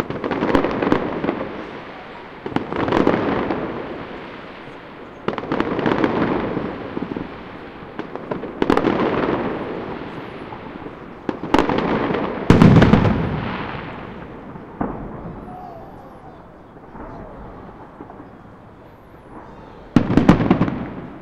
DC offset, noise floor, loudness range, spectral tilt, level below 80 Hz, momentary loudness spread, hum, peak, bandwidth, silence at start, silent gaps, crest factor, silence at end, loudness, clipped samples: under 0.1%; -43 dBFS; 20 LU; -8 dB/octave; -38 dBFS; 22 LU; none; 0 dBFS; 10 kHz; 0 s; none; 22 dB; 0 s; -20 LUFS; under 0.1%